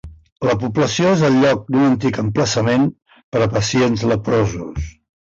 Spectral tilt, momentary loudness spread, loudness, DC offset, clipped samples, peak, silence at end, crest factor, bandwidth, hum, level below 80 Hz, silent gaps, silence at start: -5.5 dB/octave; 9 LU; -17 LUFS; under 0.1%; under 0.1%; -4 dBFS; 0.3 s; 12 dB; 7.8 kHz; none; -38 dBFS; 0.32-0.36 s, 3.24-3.32 s; 0.05 s